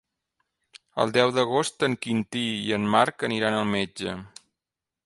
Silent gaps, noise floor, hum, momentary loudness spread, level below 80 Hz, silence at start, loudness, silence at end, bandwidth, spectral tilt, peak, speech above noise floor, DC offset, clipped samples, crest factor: none; -88 dBFS; none; 10 LU; -62 dBFS; 0.95 s; -25 LUFS; 0.8 s; 11.5 kHz; -4.5 dB/octave; -4 dBFS; 64 dB; under 0.1%; under 0.1%; 22 dB